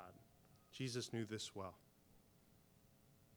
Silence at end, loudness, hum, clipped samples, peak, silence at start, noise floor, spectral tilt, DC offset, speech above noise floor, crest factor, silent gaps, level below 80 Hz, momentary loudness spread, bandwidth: 0 s; -48 LUFS; none; under 0.1%; -32 dBFS; 0 s; -71 dBFS; -4.5 dB/octave; under 0.1%; 24 dB; 20 dB; none; -80 dBFS; 20 LU; over 20 kHz